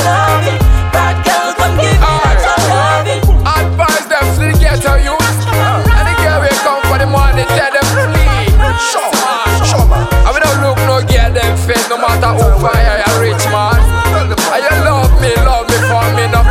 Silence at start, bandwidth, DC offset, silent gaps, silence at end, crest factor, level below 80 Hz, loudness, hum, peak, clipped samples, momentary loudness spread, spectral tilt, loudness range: 0 s; 16 kHz; under 0.1%; none; 0 s; 10 dB; -14 dBFS; -10 LUFS; none; 0 dBFS; under 0.1%; 2 LU; -4.5 dB/octave; 0 LU